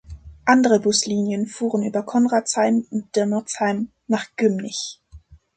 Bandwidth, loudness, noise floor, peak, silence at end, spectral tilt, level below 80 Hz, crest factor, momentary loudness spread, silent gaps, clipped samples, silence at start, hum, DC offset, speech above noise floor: 9.4 kHz; -21 LUFS; -47 dBFS; -4 dBFS; 0.2 s; -4 dB/octave; -50 dBFS; 18 dB; 9 LU; none; under 0.1%; 0.1 s; none; under 0.1%; 27 dB